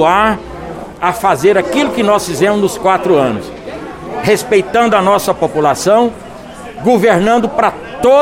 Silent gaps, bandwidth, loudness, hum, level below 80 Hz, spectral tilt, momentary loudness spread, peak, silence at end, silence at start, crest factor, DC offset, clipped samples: none; 17 kHz; -12 LUFS; none; -40 dBFS; -5 dB/octave; 16 LU; 0 dBFS; 0 s; 0 s; 12 dB; under 0.1%; under 0.1%